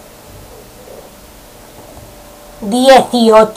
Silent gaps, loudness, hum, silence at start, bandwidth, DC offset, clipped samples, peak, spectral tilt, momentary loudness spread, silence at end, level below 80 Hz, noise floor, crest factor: none; -9 LUFS; none; 2.6 s; 16 kHz; under 0.1%; 0.3%; 0 dBFS; -4 dB/octave; 27 LU; 0.05 s; -42 dBFS; -37 dBFS; 14 dB